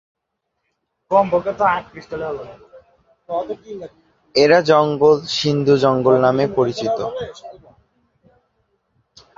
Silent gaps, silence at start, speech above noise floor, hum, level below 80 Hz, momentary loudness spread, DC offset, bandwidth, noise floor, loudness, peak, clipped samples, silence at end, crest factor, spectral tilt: none; 1.1 s; 59 dB; none; -56 dBFS; 18 LU; under 0.1%; 7.6 kHz; -76 dBFS; -17 LUFS; -2 dBFS; under 0.1%; 1.85 s; 18 dB; -6 dB/octave